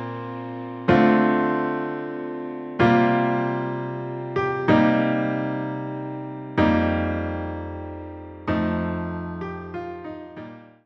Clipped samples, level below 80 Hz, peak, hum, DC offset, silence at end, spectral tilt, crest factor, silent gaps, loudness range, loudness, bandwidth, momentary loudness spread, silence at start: under 0.1%; -48 dBFS; -4 dBFS; none; under 0.1%; 0.15 s; -8.5 dB/octave; 20 dB; none; 7 LU; -24 LUFS; 6.2 kHz; 16 LU; 0 s